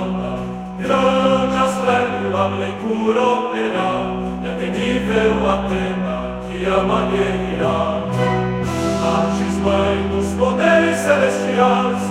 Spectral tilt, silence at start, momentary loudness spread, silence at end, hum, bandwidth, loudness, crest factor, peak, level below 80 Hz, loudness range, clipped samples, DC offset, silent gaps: -6 dB/octave; 0 s; 8 LU; 0 s; none; 13.5 kHz; -18 LUFS; 18 dB; 0 dBFS; -38 dBFS; 3 LU; under 0.1%; under 0.1%; none